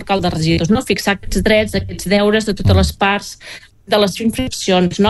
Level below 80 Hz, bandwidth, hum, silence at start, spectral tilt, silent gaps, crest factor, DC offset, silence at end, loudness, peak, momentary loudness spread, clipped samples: -30 dBFS; 12.5 kHz; none; 0 s; -5 dB/octave; none; 14 dB; under 0.1%; 0 s; -15 LUFS; -2 dBFS; 8 LU; under 0.1%